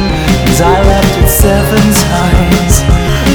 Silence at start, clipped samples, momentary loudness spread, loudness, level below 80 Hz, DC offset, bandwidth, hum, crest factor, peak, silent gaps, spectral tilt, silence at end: 0 s; 2%; 3 LU; -8 LUFS; -14 dBFS; under 0.1%; over 20 kHz; none; 8 dB; 0 dBFS; none; -5 dB/octave; 0 s